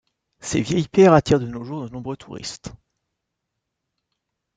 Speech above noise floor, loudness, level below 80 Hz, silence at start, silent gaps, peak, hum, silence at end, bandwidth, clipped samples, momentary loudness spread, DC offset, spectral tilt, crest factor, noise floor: 60 dB; -19 LUFS; -50 dBFS; 0.45 s; none; -2 dBFS; none; 1.85 s; 9.4 kHz; under 0.1%; 20 LU; under 0.1%; -6 dB/octave; 22 dB; -80 dBFS